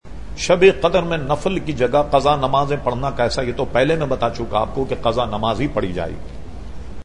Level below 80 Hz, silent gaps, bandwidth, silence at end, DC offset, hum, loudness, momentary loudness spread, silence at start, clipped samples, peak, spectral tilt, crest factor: -34 dBFS; none; 10.5 kHz; 0 s; 3%; none; -19 LUFS; 17 LU; 0 s; under 0.1%; 0 dBFS; -5.5 dB/octave; 18 dB